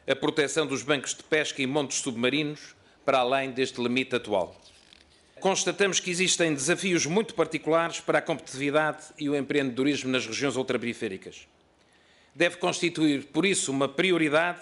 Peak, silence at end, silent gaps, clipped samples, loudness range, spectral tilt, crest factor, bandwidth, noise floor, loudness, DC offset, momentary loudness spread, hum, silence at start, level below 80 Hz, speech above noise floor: -10 dBFS; 0 s; none; under 0.1%; 4 LU; -3.5 dB/octave; 18 dB; 11.5 kHz; -62 dBFS; -26 LUFS; under 0.1%; 6 LU; none; 0.05 s; -68 dBFS; 35 dB